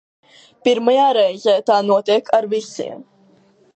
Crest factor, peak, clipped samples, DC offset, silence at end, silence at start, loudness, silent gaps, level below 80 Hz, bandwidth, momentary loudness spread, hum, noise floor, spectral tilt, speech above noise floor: 18 dB; 0 dBFS; under 0.1%; under 0.1%; 0.75 s; 0.65 s; -16 LUFS; none; -74 dBFS; 8.8 kHz; 12 LU; none; -53 dBFS; -4.5 dB/octave; 37 dB